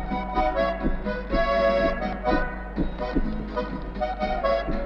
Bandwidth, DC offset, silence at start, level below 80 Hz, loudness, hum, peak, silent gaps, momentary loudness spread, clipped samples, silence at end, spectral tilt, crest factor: 6.4 kHz; under 0.1%; 0 s; -32 dBFS; -26 LUFS; none; -10 dBFS; none; 9 LU; under 0.1%; 0 s; -7.5 dB/octave; 14 dB